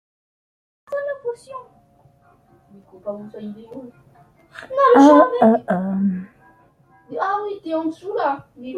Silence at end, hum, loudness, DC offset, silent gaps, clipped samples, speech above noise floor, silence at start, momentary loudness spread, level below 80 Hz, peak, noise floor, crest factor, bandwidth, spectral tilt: 0 s; none; -18 LUFS; under 0.1%; none; under 0.1%; 36 dB; 0.9 s; 25 LU; -64 dBFS; -2 dBFS; -55 dBFS; 18 dB; 9.8 kHz; -7 dB/octave